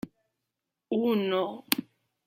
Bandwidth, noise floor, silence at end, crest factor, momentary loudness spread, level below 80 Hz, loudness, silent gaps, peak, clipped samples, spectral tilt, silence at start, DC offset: 16.5 kHz; -86 dBFS; 0.45 s; 28 dB; 6 LU; -72 dBFS; -29 LUFS; none; -4 dBFS; under 0.1%; -4.5 dB/octave; 0.05 s; under 0.1%